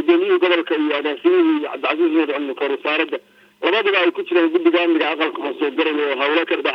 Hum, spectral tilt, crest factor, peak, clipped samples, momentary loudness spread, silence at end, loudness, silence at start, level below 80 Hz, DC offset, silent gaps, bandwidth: none; -4.5 dB/octave; 16 dB; -2 dBFS; under 0.1%; 6 LU; 0 s; -18 LUFS; 0 s; -82 dBFS; under 0.1%; none; 5.6 kHz